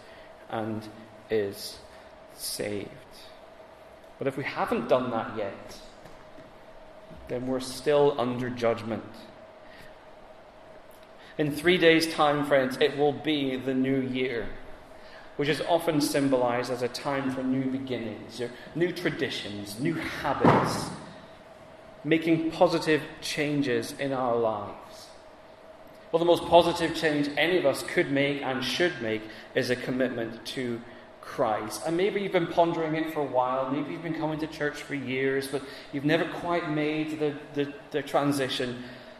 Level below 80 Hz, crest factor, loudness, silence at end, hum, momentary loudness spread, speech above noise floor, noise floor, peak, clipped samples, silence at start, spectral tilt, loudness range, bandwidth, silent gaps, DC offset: -58 dBFS; 24 dB; -28 LUFS; 0 s; none; 21 LU; 22 dB; -50 dBFS; -6 dBFS; under 0.1%; 0 s; -5 dB/octave; 7 LU; 14 kHz; none; under 0.1%